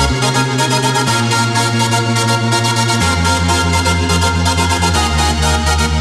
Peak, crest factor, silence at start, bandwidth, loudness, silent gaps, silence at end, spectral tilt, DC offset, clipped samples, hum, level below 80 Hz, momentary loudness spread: -2 dBFS; 12 dB; 0 s; 15 kHz; -13 LUFS; none; 0 s; -4 dB/octave; under 0.1%; under 0.1%; none; -24 dBFS; 1 LU